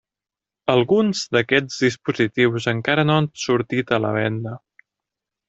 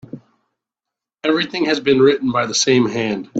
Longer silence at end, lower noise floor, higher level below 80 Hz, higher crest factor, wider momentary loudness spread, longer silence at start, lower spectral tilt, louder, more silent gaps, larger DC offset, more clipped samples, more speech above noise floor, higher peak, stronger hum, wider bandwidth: first, 0.9 s vs 0 s; first, -89 dBFS vs -85 dBFS; about the same, -58 dBFS vs -60 dBFS; about the same, 18 dB vs 16 dB; about the same, 7 LU vs 6 LU; first, 0.65 s vs 0.15 s; first, -5.5 dB/octave vs -4 dB/octave; second, -20 LUFS vs -16 LUFS; neither; neither; neither; about the same, 69 dB vs 69 dB; about the same, -2 dBFS vs -2 dBFS; neither; about the same, 8 kHz vs 8.8 kHz